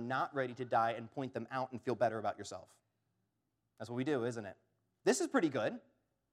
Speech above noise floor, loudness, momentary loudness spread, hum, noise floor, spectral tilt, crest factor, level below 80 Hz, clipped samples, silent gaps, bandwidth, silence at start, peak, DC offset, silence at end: 48 dB; -37 LUFS; 14 LU; none; -84 dBFS; -5 dB/octave; 20 dB; -86 dBFS; under 0.1%; none; 15.5 kHz; 0 s; -18 dBFS; under 0.1%; 0.55 s